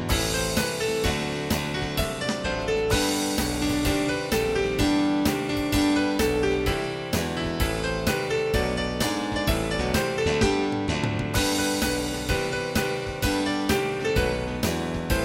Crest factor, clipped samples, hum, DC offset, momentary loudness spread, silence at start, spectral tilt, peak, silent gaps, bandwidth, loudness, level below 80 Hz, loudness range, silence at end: 16 dB; under 0.1%; none; under 0.1%; 4 LU; 0 s; -4.5 dB/octave; -8 dBFS; none; 17 kHz; -25 LUFS; -36 dBFS; 2 LU; 0 s